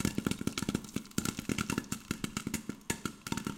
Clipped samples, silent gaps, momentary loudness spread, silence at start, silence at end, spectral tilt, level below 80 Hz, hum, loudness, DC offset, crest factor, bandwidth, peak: under 0.1%; none; 4 LU; 0 s; 0 s; -4 dB/octave; -54 dBFS; none; -37 LUFS; under 0.1%; 22 dB; 17 kHz; -14 dBFS